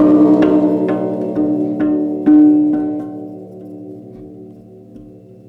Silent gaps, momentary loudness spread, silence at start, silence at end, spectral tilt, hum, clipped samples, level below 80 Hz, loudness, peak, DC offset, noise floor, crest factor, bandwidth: none; 23 LU; 0 s; 0.4 s; -10 dB/octave; none; under 0.1%; -52 dBFS; -14 LUFS; -2 dBFS; under 0.1%; -38 dBFS; 12 dB; 3.9 kHz